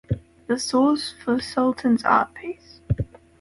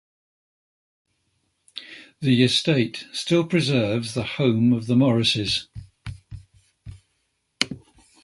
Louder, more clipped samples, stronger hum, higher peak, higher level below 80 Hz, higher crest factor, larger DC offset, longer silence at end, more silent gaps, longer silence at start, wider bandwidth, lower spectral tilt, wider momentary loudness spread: about the same, -23 LUFS vs -21 LUFS; neither; neither; second, -6 dBFS vs 0 dBFS; first, -44 dBFS vs -52 dBFS; second, 18 dB vs 24 dB; neither; about the same, 0.35 s vs 0.45 s; neither; second, 0.1 s vs 1.75 s; about the same, 11.5 kHz vs 11.5 kHz; about the same, -5.5 dB/octave vs -5.5 dB/octave; second, 15 LU vs 21 LU